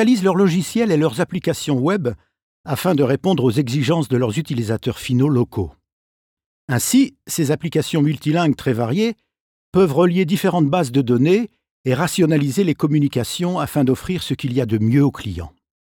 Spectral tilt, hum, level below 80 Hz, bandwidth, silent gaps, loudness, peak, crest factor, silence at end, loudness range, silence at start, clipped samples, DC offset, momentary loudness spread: -6 dB/octave; none; -50 dBFS; 18 kHz; 2.42-2.64 s, 5.92-6.37 s, 6.46-6.68 s, 9.40-9.72 s, 11.71-11.84 s; -19 LUFS; -4 dBFS; 14 dB; 0.5 s; 3 LU; 0 s; under 0.1%; under 0.1%; 8 LU